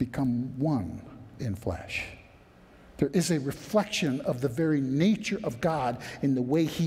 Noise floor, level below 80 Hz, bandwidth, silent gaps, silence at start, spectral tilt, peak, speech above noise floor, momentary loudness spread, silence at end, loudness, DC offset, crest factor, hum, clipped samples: -54 dBFS; -54 dBFS; 16 kHz; none; 0 s; -6 dB/octave; -10 dBFS; 27 dB; 9 LU; 0 s; -29 LUFS; under 0.1%; 18 dB; none; under 0.1%